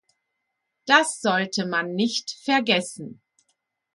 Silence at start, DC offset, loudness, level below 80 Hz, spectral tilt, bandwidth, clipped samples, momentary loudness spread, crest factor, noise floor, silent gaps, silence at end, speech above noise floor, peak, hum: 0.85 s; under 0.1%; -22 LUFS; -74 dBFS; -3 dB/octave; 11.5 kHz; under 0.1%; 18 LU; 24 dB; -79 dBFS; none; 0.8 s; 56 dB; -2 dBFS; none